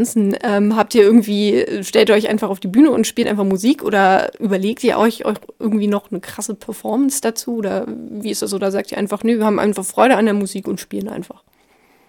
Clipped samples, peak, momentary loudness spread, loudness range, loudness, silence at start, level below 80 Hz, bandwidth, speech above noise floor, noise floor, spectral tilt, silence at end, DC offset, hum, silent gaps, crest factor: under 0.1%; 0 dBFS; 13 LU; 6 LU; -17 LUFS; 0 s; -58 dBFS; 17.5 kHz; 38 dB; -55 dBFS; -5 dB/octave; 0.85 s; under 0.1%; none; none; 16 dB